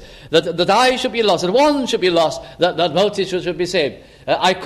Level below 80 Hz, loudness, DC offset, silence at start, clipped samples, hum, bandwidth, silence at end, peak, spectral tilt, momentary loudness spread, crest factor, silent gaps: -48 dBFS; -17 LUFS; under 0.1%; 0 s; under 0.1%; none; 14.5 kHz; 0 s; 0 dBFS; -4 dB/octave; 7 LU; 16 dB; none